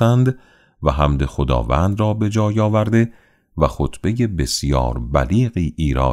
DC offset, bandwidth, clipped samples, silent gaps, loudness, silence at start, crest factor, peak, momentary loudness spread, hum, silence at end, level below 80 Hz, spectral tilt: under 0.1%; 13.5 kHz; under 0.1%; none; -19 LUFS; 0 s; 16 dB; -2 dBFS; 5 LU; none; 0 s; -26 dBFS; -6.5 dB/octave